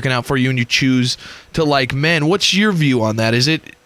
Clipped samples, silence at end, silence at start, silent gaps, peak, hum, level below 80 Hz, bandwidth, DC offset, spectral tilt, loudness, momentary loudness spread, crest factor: under 0.1%; 0.25 s; 0 s; none; -2 dBFS; none; -46 dBFS; 14.5 kHz; under 0.1%; -4.5 dB/octave; -15 LUFS; 6 LU; 14 dB